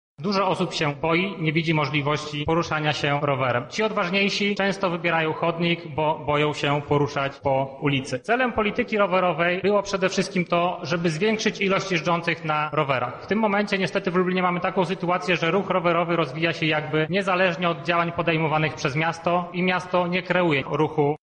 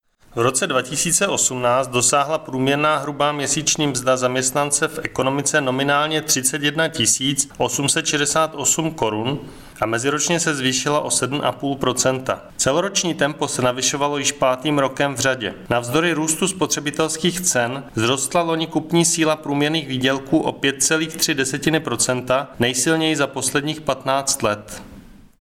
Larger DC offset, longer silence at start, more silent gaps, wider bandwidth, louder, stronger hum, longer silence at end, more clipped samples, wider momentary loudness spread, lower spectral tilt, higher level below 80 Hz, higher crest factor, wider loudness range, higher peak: neither; second, 0.2 s vs 0.35 s; neither; second, 10 kHz vs 17 kHz; second, -23 LUFS vs -19 LUFS; neither; second, 0.05 s vs 0.25 s; neither; about the same, 3 LU vs 5 LU; first, -5.5 dB/octave vs -3 dB/octave; about the same, -56 dBFS vs -52 dBFS; about the same, 14 dB vs 18 dB; about the same, 1 LU vs 2 LU; second, -8 dBFS vs -2 dBFS